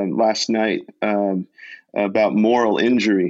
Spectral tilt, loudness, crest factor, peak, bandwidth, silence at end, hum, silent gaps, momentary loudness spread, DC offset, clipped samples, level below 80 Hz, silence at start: -5 dB/octave; -19 LUFS; 12 dB; -6 dBFS; 8 kHz; 0 s; none; none; 8 LU; under 0.1%; under 0.1%; -68 dBFS; 0 s